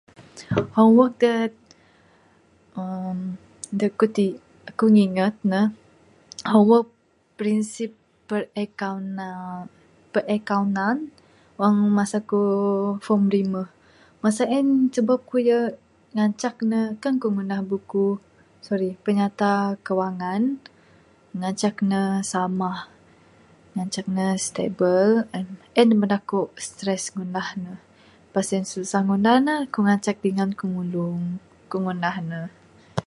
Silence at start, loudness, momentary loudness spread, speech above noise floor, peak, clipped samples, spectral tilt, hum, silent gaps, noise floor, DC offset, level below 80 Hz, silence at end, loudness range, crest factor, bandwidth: 0.2 s; -23 LUFS; 15 LU; 36 dB; -2 dBFS; under 0.1%; -6 dB/octave; none; none; -58 dBFS; under 0.1%; -64 dBFS; 0.05 s; 5 LU; 20 dB; 11.5 kHz